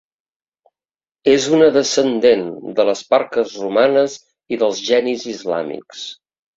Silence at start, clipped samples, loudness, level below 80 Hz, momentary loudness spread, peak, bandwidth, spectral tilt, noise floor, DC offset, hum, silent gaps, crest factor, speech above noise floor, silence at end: 1.25 s; under 0.1%; -17 LUFS; -60 dBFS; 15 LU; 0 dBFS; 7.8 kHz; -3.5 dB/octave; under -90 dBFS; under 0.1%; none; none; 16 dB; over 74 dB; 0.4 s